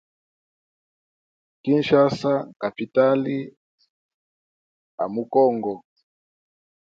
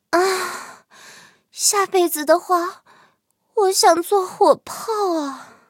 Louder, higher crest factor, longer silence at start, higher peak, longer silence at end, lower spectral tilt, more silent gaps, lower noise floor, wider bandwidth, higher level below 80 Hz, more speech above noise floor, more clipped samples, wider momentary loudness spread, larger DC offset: second, -22 LUFS vs -18 LUFS; about the same, 20 dB vs 20 dB; first, 1.65 s vs 0.1 s; second, -4 dBFS vs 0 dBFS; first, 1.15 s vs 0.25 s; first, -7.5 dB/octave vs -1 dB/octave; first, 2.56-2.60 s, 3.57-3.78 s, 3.89-4.98 s vs none; first, under -90 dBFS vs -64 dBFS; second, 7.6 kHz vs 17 kHz; first, -68 dBFS vs -74 dBFS; first, over 69 dB vs 46 dB; neither; about the same, 13 LU vs 14 LU; neither